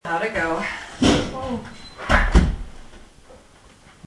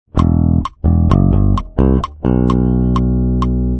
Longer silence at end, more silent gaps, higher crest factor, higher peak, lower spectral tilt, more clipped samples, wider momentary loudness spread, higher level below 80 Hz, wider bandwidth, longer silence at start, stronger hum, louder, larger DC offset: first, 0.7 s vs 0 s; neither; first, 20 dB vs 12 dB; about the same, -2 dBFS vs 0 dBFS; second, -5 dB/octave vs -10 dB/octave; neither; first, 17 LU vs 4 LU; second, -28 dBFS vs -18 dBFS; first, 12 kHz vs 8 kHz; about the same, 0.05 s vs 0.15 s; neither; second, -22 LUFS vs -14 LUFS; neither